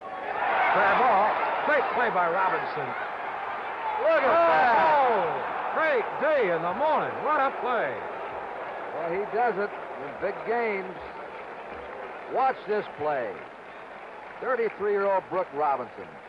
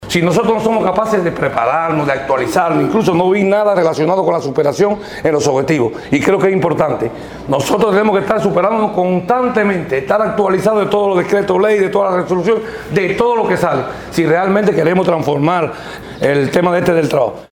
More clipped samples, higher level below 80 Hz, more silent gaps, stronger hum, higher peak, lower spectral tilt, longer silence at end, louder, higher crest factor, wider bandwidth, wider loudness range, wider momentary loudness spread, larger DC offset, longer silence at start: neither; second, -66 dBFS vs -46 dBFS; neither; neither; second, -12 dBFS vs 0 dBFS; about the same, -6 dB/octave vs -6 dB/octave; about the same, 0 s vs 0.05 s; second, -26 LUFS vs -14 LUFS; about the same, 14 dB vs 14 dB; second, 7.4 kHz vs 18.5 kHz; first, 8 LU vs 1 LU; first, 17 LU vs 5 LU; neither; about the same, 0 s vs 0 s